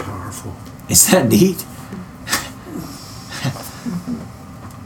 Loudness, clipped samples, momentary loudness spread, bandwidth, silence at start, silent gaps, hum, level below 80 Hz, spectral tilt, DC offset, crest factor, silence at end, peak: -16 LUFS; under 0.1%; 22 LU; 19 kHz; 0 s; none; none; -46 dBFS; -3.5 dB/octave; under 0.1%; 20 dB; 0 s; 0 dBFS